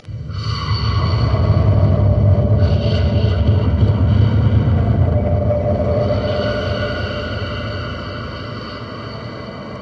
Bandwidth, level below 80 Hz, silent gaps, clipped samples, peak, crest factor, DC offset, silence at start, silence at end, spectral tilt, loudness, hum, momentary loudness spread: 6.2 kHz; -26 dBFS; none; under 0.1%; -2 dBFS; 14 dB; under 0.1%; 0.05 s; 0 s; -8.5 dB/octave; -17 LUFS; none; 14 LU